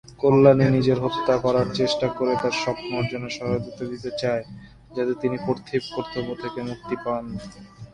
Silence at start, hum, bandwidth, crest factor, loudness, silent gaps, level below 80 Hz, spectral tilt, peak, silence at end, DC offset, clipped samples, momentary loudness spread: 0.1 s; none; 10.5 kHz; 22 dB; -23 LUFS; none; -52 dBFS; -6.5 dB/octave; -2 dBFS; 0.05 s; under 0.1%; under 0.1%; 15 LU